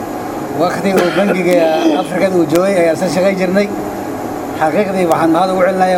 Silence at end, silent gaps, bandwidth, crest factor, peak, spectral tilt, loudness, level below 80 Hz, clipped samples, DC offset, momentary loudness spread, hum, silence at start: 0 s; none; 16.5 kHz; 14 dB; 0 dBFS; -6 dB/octave; -14 LUFS; -46 dBFS; under 0.1%; under 0.1%; 10 LU; none; 0 s